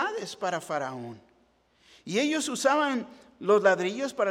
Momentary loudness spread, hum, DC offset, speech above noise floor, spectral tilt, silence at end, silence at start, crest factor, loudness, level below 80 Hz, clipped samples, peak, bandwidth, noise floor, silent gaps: 17 LU; none; under 0.1%; 38 dB; -3.5 dB/octave; 0 s; 0 s; 20 dB; -27 LUFS; -74 dBFS; under 0.1%; -8 dBFS; 15.5 kHz; -66 dBFS; none